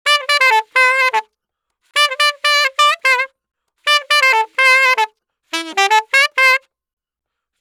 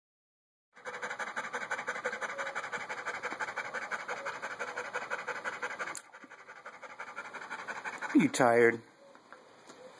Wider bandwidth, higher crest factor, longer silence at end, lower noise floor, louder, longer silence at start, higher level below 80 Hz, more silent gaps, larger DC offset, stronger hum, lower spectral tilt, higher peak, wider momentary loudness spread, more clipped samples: first, 20 kHz vs 11 kHz; second, 16 dB vs 24 dB; first, 1 s vs 0 s; first, -77 dBFS vs -56 dBFS; first, -13 LUFS vs -34 LUFS; second, 0.05 s vs 0.75 s; about the same, -82 dBFS vs -84 dBFS; neither; neither; neither; second, 3.5 dB/octave vs -4.5 dB/octave; first, 0 dBFS vs -12 dBFS; second, 10 LU vs 22 LU; neither